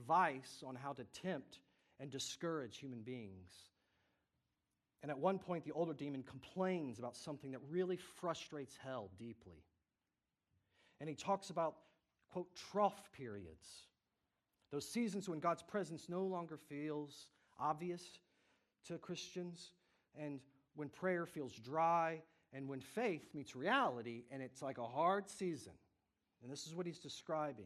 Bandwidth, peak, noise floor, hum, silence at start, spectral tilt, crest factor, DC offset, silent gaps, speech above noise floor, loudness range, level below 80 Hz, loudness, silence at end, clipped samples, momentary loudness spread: 13.5 kHz; -22 dBFS; under -90 dBFS; none; 0 s; -5 dB/octave; 22 dB; under 0.1%; none; over 46 dB; 7 LU; -84 dBFS; -44 LUFS; 0 s; under 0.1%; 17 LU